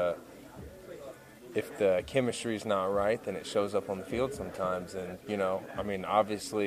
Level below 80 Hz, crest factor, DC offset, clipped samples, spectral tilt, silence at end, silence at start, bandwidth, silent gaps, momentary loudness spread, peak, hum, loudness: -60 dBFS; 20 dB; under 0.1%; under 0.1%; -5 dB/octave; 0 s; 0 s; 15 kHz; none; 18 LU; -12 dBFS; none; -32 LUFS